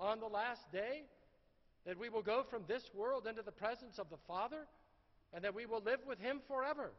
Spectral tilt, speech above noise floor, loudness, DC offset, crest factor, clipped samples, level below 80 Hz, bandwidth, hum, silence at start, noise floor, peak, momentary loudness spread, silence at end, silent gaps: -2 dB/octave; 30 dB; -43 LUFS; under 0.1%; 18 dB; under 0.1%; -74 dBFS; 6 kHz; none; 0 s; -73 dBFS; -26 dBFS; 11 LU; 0 s; none